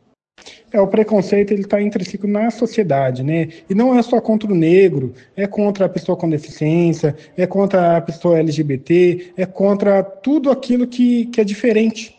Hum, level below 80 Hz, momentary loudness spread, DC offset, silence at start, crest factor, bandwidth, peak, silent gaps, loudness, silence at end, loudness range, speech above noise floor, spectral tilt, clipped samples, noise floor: none; -58 dBFS; 7 LU; under 0.1%; 0.45 s; 14 dB; 8.8 kHz; -2 dBFS; none; -16 LUFS; 0.1 s; 2 LU; 30 dB; -7.5 dB/octave; under 0.1%; -45 dBFS